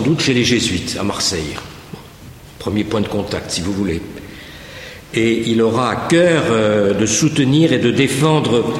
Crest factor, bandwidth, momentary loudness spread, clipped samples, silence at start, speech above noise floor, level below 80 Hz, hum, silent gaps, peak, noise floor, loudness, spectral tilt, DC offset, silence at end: 14 dB; 16 kHz; 19 LU; under 0.1%; 0 s; 22 dB; -42 dBFS; none; none; -2 dBFS; -38 dBFS; -16 LUFS; -4.5 dB/octave; under 0.1%; 0 s